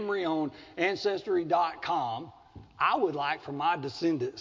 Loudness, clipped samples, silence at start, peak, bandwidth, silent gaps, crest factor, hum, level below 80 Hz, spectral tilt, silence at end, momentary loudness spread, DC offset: -30 LUFS; under 0.1%; 0 s; -12 dBFS; 7.6 kHz; none; 18 dB; none; -66 dBFS; -5.5 dB/octave; 0 s; 7 LU; under 0.1%